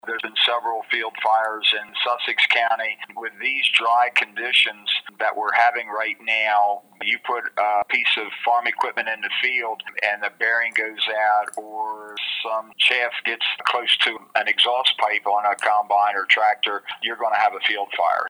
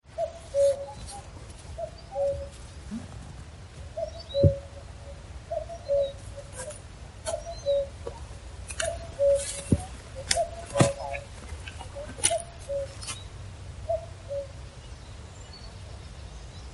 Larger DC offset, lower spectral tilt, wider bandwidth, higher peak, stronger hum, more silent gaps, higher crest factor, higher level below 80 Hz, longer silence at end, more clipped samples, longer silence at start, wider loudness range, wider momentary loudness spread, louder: neither; second, 0 dB/octave vs -4.5 dB/octave; first, over 20 kHz vs 11.5 kHz; about the same, -2 dBFS vs -2 dBFS; neither; neither; second, 20 dB vs 30 dB; second, -82 dBFS vs -44 dBFS; about the same, 0 s vs 0 s; neither; about the same, 0.05 s vs 0.05 s; second, 3 LU vs 9 LU; second, 8 LU vs 19 LU; first, -20 LUFS vs -30 LUFS